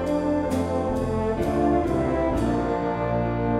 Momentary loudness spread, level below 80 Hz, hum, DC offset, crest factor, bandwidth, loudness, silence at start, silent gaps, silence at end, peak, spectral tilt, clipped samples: 3 LU; -36 dBFS; none; under 0.1%; 14 dB; 14 kHz; -24 LUFS; 0 s; none; 0 s; -10 dBFS; -8 dB/octave; under 0.1%